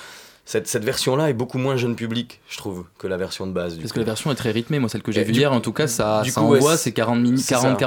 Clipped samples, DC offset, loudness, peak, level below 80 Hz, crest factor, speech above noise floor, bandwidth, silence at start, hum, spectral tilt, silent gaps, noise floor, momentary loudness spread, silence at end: under 0.1%; under 0.1%; -21 LUFS; -2 dBFS; -56 dBFS; 18 dB; 22 dB; 19.5 kHz; 0 s; none; -5 dB/octave; none; -42 dBFS; 12 LU; 0 s